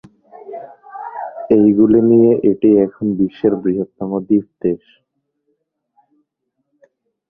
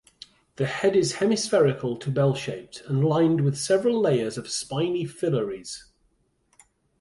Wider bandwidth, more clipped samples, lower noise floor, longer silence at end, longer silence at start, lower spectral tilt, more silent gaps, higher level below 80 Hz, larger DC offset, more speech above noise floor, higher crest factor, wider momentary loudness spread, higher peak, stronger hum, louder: second, 3.6 kHz vs 11.5 kHz; neither; first, -72 dBFS vs -68 dBFS; first, 2.55 s vs 1.2 s; second, 0.45 s vs 0.6 s; first, -12 dB/octave vs -5.5 dB/octave; neither; first, -54 dBFS vs -62 dBFS; neither; first, 59 dB vs 44 dB; about the same, 16 dB vs 16 dB; first, 22 LU vs 10 LU; first, -2 dBFS vs -10 dBFS; neither; first, -14 LUFS vs -24 LUFS